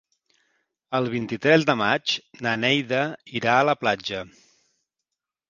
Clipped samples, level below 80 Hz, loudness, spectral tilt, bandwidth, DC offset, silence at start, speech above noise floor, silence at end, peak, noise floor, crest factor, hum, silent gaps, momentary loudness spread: under 0.1%; -64 dBFS; -23 LUFS; -5 dB/octave; 7.4 kHz; under 0.1%; 0.9 s; 62 dB; 1.2 s; -2 dBFS; -85 dBFS; 24 dB; none; none; 10 LU